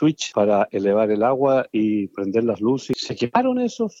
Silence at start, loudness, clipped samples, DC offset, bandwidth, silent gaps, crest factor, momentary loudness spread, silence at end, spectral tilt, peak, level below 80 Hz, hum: 0 s; -21 LUFS; under 0.1%; under 0.1%; 8 kHz; none; 16 dB; 5 LU; 0.1 s; -6 dB/octave; -4 dBFS; -64 dBFS; none